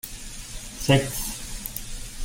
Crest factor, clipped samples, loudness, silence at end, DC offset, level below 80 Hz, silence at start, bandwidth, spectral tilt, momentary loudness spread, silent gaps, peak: 24 dB; under 0.1%; -27 LUFS; 0 s; under 0.1%; -38 dBFS; 0.05 s; 16.5 kHz; -4.5 dB/octave; 16 LU; none; -4 dBFS